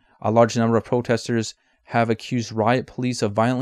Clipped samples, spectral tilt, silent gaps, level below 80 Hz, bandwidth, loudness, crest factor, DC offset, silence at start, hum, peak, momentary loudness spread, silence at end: under 0.1%; -6 dB/octave; none; -60 dBFS; 12 kHz; -22 LUFS; 18 dB; under 0.1%; 0.2 s; none; -2 dBFS; 8 LU; 0 s